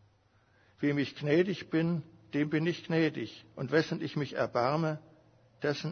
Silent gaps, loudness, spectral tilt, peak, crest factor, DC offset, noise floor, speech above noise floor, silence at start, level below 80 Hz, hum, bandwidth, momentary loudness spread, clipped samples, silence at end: none; -32 LUFS; -7 dB/octave; -14 dBFS; 18 dB; under 0.1%; -67 dBFS; 36 dB; 0.8 s; -72 dBFS; none; 6.6 kHz; 9 LU; under 0.1%; 0 s